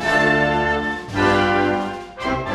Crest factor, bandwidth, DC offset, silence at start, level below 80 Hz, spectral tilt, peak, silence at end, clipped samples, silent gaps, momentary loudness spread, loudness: 16 dB; 13 kHz; under 0.1%; 0 s; -40 dBFS; -5.5 dB/octave; -4 dBFS; 0 s; under 0.1%; none; 9 LU; -19 LUFS